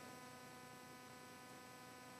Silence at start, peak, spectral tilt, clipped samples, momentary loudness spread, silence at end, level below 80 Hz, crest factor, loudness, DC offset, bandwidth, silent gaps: 0 s; -44 dBFS; -3 dB/octave; under 0.1%; 1 LU; 0 s; -90 dBFS; 14 dB; -57 LUFS; under 0.1%; 14.5 kHz; none